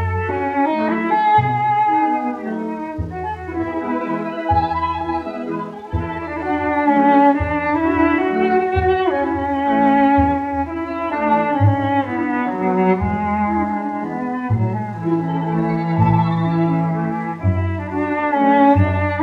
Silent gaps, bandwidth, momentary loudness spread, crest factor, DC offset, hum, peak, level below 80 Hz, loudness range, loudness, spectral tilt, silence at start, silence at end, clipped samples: none; 6.8 kHz; 11 LU; 16 dB; under 0.1%; none; -2 dBFS; -42 dBFS; 5 LU; -18 LUFS; -9.5 dB/octave; 0 s; 0 s; under 0.1%